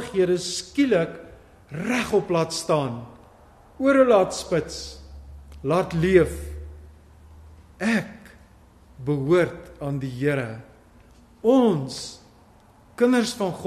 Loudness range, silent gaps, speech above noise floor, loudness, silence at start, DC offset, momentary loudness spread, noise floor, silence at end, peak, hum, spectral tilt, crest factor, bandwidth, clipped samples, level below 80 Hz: 5 LU; none; 31 dB; -23 LUFS; 0 s; under 0.1%; 19 LU; -53 dBFS; 0 s; -4 dBFS; none; -5.5 dB/octave; 20 dB; 13 kHz; under 0.1%; -46 dBFS